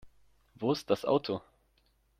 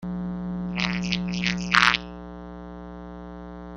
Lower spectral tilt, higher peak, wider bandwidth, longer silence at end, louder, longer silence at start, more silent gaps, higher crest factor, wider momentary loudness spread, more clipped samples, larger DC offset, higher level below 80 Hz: first, -6 dB/octave vs -4 dB/octave; second, -14 dBFS vs 0 dBFS; first, 15 kHz vs 10 kHz; first, 0.8 s vs 0 s; second, -32 LUFS vs -24 LUFS; about the same, 0.05 s vs 0 s; neither; second, 22 dB vs 28 dB; second, 9 LU vs 21 LU; neither; neither; second, -68 dBFS vs -46 dBFS